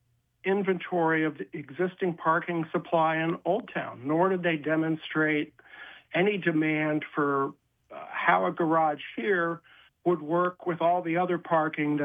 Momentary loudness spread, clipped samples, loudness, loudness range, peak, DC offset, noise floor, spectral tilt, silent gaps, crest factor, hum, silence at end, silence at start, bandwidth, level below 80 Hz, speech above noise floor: 10 LU; under 0.1%; -27 LUFS; 1 LU; -8 dBFS; under 0.1%; -48 dBFS; -9 dB/octave; none; 20 dB; none; 0 s; 0.45 s; 3.8 kHz; -78 dBFS; 21 dB